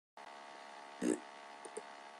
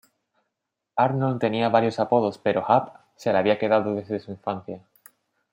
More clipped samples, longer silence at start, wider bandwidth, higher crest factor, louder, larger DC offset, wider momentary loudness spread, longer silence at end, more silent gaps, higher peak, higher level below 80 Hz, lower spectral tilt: neither; second, 0.15 s vs 0.95 s; second, 12.5 kHz vs 16.5 kHz; about the same, 24 dB vs 20 dB; second, -45 LUFS vs -24 LUFS; neither; first, 14 LU vs 11 LU; second, 0 s vs 0.75 s; neither; second, -22 dBFS vs -4 dBFS; second, -86 dBFS vs -70 dBFS; second, -4 dB/octave vs -7.5 dB/octave